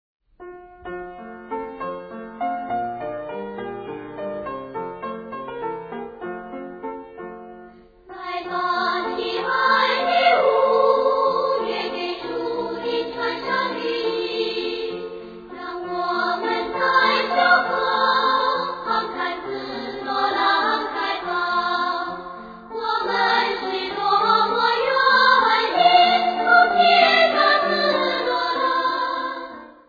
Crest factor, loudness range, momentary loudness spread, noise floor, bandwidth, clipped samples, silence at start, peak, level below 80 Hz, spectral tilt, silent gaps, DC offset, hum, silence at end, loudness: 20 dB; 15 LU; 18 LU; -46 dBFS; 5 kHz; under 0.1%; 0.4 s; -2 dBFS; -58 dBFS; -4.5 dB/octave; none; under 0.1%; none; 0.15 s; -20 LUFS